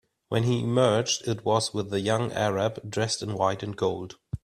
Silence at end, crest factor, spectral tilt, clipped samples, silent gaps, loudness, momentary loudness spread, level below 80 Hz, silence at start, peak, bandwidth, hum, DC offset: 0.05 s; 18 dB; -5 dB/octave; under 0.1%; none; -26 LUFS; 7 LU; -56 dBFS; 0.3 s; -8 dBFS; 13.5 kHz; none; under 0.1%